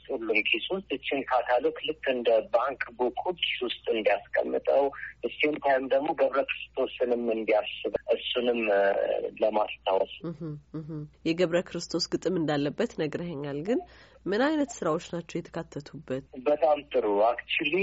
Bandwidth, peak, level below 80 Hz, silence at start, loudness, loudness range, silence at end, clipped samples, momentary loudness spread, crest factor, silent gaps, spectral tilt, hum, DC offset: 8 kHz; -12 dBFS; -62 dBFS; 0.1 s; -28 LUFS; 3 LU; 0 s; under 0.1%; 11 LU; 16 dB; none; -3 dB/octave; none; under 0.1%